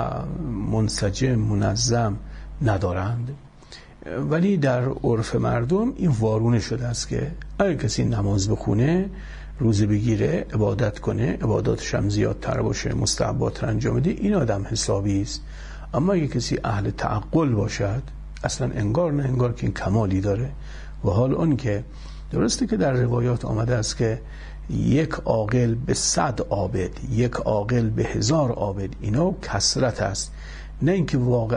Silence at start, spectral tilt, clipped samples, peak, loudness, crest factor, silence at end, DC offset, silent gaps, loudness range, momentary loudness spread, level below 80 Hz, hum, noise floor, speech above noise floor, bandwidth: 0 s; -5.5 dB/octave; under 0.1%; -6 dBFS; -23 LUFS; 16 dB; 0 s; under 0.1%; none; 2 LU; 9 LU; -38 dBFS; none; -45 dBFS; 22 dB; 10.5 kHz